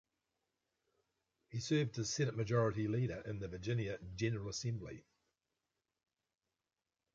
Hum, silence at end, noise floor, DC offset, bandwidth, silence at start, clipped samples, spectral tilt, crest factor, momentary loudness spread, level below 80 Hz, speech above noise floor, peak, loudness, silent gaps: none; 2.15 s; under -90 dBFS; under 0.1%; 7.6 kHz; 1.5 s; under 0.1%; -5.5 dB/octave; 20 dB; 10 LU; -64 dBFS; over 52 dB; -22 dBFS; -39 LUFS; none